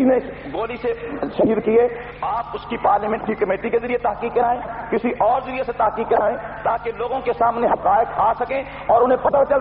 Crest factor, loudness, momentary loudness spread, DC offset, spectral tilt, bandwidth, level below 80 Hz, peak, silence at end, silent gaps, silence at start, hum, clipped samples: 14 dB; -20 LUFS; 8 LU; under 0.1%; -4.5 dB/octave; 5.2 kHz; -46 dBFS; -6 dBFS; 0 s; none; 0 s; 50 Hz at -45 dBFS; under 0.1%